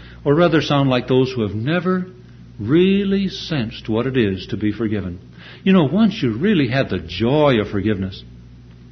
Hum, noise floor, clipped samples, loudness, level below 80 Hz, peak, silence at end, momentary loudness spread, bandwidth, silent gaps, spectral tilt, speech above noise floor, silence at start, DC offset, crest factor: none; -41 dBFS; under 0.1%; -18 LUFS; -44 dBFS; -2 dBFS; 0.05 s; 9 LU; 6.4 kHz; none; -7.5 dB/octave; 23 dB; 0 s; under 0.1%; 16 dB